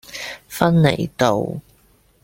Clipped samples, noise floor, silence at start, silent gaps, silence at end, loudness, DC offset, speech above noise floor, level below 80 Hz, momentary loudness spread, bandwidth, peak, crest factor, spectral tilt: under 0.1%; -56 dBFS; 0.1 s; none; 0.65 s; -19 LUFS; under 0.1%; 39 dB; -50 dBFS; 15 LU; 16.5 kHz; -2 dBFS; 18 dB; -6 dB/octave